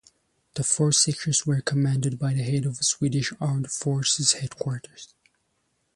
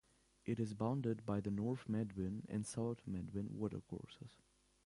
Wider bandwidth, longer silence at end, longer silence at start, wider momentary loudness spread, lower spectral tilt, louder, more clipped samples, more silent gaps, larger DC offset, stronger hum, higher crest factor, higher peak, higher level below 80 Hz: about the same, 11.5 kHz vs 11.5 kHz; first, 0.9 s vs 0.5 s; about the same, 0.55 s vs 0.45 s; about the same, 11 LU vs 12 LU; second, -3.5 dB/octave vs -7.5 dB/octave; first, -24 LUFS vs -43 LUFS; neither; neither; neither; neither; about the same, 20 dB vs 18 dB; first, -6 dBFS vs -26 dBFS; first, -60 dBFS vs -66 dBFS